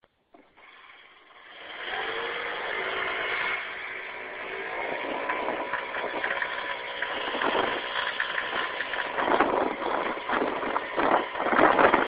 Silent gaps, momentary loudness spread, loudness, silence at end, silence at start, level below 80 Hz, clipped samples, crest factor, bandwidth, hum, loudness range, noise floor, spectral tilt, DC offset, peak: none; 10 LU; -28 LUFS; 0 s; 0.6 s; -60 dBFS; under 0.1%; 24 dB; 5.2 kHz; none; 4 LU; -59 dBFS; -7.5 dB/octave; under 0.1%; -4 dBFS